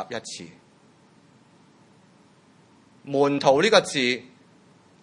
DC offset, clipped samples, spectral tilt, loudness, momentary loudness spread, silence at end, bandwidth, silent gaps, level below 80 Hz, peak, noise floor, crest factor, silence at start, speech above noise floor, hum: under 0.1%; under 0.1%; -3.5 dB/octave; -21 LUFS; 20 LU; 0.8 s; 11.5 kHz; none; -74 dBFS; -2 dBFS; -56 dBFS; 24 dB; 0 s; 34 dB; none